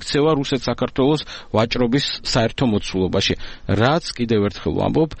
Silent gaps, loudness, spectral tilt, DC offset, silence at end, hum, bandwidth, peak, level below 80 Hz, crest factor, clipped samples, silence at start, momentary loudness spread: none; -20 LUFS; -5.5 dB/octave; under 0.1%; 0 s; none; 8.8 kHz; -2 dBFS; -38 dBFS; 18 dB; under 0.1%; 0 s; 4 LU